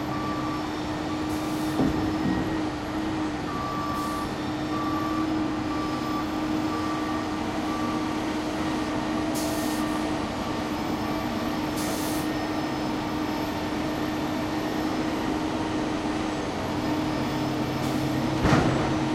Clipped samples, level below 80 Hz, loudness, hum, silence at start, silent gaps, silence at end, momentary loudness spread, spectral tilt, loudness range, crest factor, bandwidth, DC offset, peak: under 0.1%; -44 dBFS; -28 LUFS; none; 0 s; none; 0 s; 4 LU; -5.5 dB/octave; 1 LU; 20 dB; 16 kHz; under 0.1%; -8 dBFS